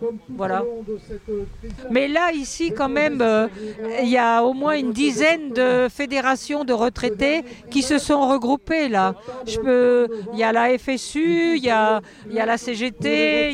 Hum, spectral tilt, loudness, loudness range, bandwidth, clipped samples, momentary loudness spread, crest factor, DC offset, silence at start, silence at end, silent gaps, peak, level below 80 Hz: none; -4 dB/octave; -20 LUFS; 3 LU; 12.5 kHz; under 0.1%; 11 LU; 16 dB; under 0.1%; 0 s; 0 s; none; -4 dBFS; -46 dBFS